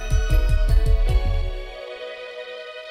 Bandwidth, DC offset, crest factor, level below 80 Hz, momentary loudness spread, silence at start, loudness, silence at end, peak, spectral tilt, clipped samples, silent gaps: 13 kHz; under 0.1%; 14 dB; -20 dBFS; 13 LU; 0 s; -25 LUFS; 0 s; -6 dBFS; -5.5 dB/octave; under 0.1%; none